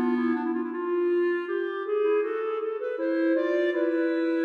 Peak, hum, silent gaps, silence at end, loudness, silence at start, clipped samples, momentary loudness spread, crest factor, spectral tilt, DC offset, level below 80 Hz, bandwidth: -14 dBFS; none; none; 0 s; -27 LUFS; 0 s; under 0.1%; 5 LU; 10 dB; -6 dB/octave; under 0.1%; under -90 dBFS; 4.9 kHz